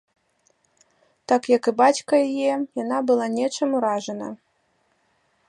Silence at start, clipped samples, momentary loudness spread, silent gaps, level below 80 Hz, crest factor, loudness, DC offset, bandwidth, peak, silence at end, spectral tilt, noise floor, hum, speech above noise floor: 1.3 s; under 0.1%; 14 LU; none; -76 dBFS; 20 dB; -22 LUFS; under 0.1%; 11.5 kHz; -4 dBFS; 1.15 s; -4 dB/octave; -67 dBFS; none; 46 dB